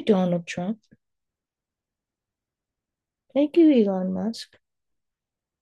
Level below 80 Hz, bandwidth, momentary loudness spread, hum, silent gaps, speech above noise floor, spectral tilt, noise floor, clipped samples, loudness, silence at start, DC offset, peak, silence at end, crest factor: -74 dBFS; 10 kHz; 19 LU; none; none; 67 dB; -7.5 dB/octave; -89 dBFS; under 0.1%; -23 LUFS; 0 s; under 0.1%; -8 dBFS; 1.2 s; 18 dB